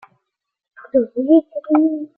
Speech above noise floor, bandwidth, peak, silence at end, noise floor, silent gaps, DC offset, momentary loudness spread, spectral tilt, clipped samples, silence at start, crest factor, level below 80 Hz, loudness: 63 dB; 3.5 kHz; -2 dBFS; 0.1 s; -79 dBFS; none; under 0.1%; 5 LU; -10.5 dB/octave; under 0.1%; 0.8 s; 16 dB; -64 dBFS; -17 LUFS